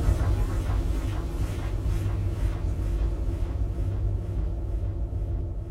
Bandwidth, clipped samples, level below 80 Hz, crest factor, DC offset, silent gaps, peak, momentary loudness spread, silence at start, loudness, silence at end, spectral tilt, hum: 12 kHz; under 0.1%; -28 dBFS; 16 dB; under 0.1%; none; -10 dBFS; 4 LU; 0 s; -30 LUFS; 0 s; -7.5 dB/octave; none